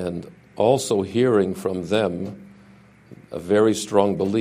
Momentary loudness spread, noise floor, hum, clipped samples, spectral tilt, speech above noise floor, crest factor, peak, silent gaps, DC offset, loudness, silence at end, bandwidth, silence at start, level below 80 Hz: 16 LU; -50 dBFS; none; under 0.1%; -5.5 dB/octave; 29 dB; 20 dB; -2 dBFS; none; under 0.1%; -21 LUFS; 0 s; 15.5 kHz; 0 s; -58 dBFS